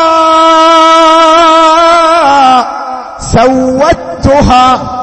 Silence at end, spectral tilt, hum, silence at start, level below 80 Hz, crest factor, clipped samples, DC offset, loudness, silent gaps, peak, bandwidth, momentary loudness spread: 0 s; -4.5 dB/octave; none; 0 s; -26 dBFS; 6 dB; 2%; under 0.1%; -5 LUFS; none; 0 dBFS; 11 kHz; 8 LU